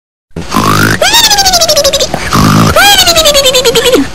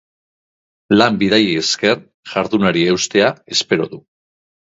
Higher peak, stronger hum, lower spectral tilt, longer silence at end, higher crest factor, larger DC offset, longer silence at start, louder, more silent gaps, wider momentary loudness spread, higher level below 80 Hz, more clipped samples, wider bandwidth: about the same, 0 dBFS vs 0 dBFS; neither; second, -2.5 dB/octave vs -4 dB/octave; second, 0 s vs 0.8 s; second, 8 dB vs 18 dB; first, 7% vs under 0.1%; second, 0.25 s vs 0.9 s; first, -5 LUFS vs -15 LUFS; second, none vs 2.14-2.23 s; about the same, 7 LU vs 8 LU; first, -26 dBFS vs -54 dBFS; first, 2% vs under 0.1%; first, over 20 kHz vs 8 kHz